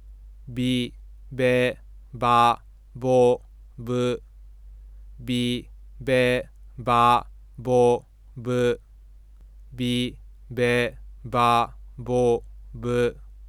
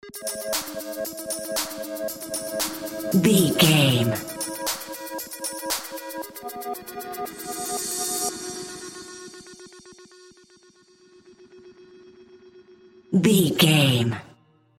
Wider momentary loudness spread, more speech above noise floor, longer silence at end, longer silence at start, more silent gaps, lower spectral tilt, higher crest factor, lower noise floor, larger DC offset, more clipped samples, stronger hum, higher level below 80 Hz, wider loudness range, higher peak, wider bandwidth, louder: about the same, 17 LU vs 18 LU; second, 26 dB vs 36 dB; second, 0 s vs 0.5 s; about the same, 0 s vs 0.05 s; neither; first, -6 dB/octave vs -4 dB/octave; about the same, 18 dB vs 22 dB; second, -48 dBFS vs -56 dBFS; neither; neither; neither; first, -44 dBFS vs -62 dBFS; second, 4 LU vs 11 LU; about the same, -6 dBFS vs -4 dBFS; second, 14.5 kHz vs 17 kHz; about the same, -24 LUFS vs -24 LUFS